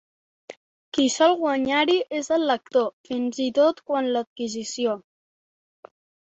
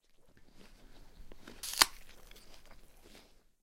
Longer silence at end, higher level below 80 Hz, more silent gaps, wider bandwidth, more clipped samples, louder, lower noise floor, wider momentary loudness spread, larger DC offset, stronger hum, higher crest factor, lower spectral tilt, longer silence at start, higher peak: first, 1.4 s vs 0.35 s; second, -68 dBFS vs -58 dBFS; first, 0.57-0.92 s, 2.93-3.04 s, 4.27-4.36 s vs none; second, 8.2 kHz vs 16.5 kHz; neither; first, -23 LUFS vs -31 LUFS; first, under -90 dBFS vs -60 dBFS; second, 10 LU vs 28 LU; neither; neither; second, 18 dB vs 36 dB; first, -2.5 dB/octave vs 1 dB/octave; first, 0.5 s vs 0.2 s; about the same, -6 dBFS vs -4 dBFS